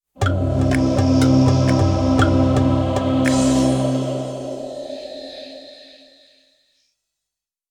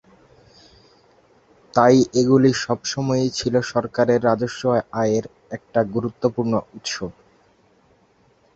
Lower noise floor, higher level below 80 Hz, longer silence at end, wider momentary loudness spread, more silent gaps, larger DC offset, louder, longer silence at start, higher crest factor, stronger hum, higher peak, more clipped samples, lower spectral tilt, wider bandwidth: first, -85 dBFS vs -59 dBFS; first, -36 dBFS vs -56 dBFS; first, 1.95 s vs 1.45 s; first, 17 LU vs 12 LU; neither; neither; about the same, -18 LUFS vs -20 LUFS; second, 0.2 s vs 1.75 s; second, 16 dB vs 22 dB; neither; second, -4 dBFS vs 0 dBFS; neither; about the same, -6.5 dB/octave vs -5.5 dB/octave; first, 11.5 kHz vs 8 kHz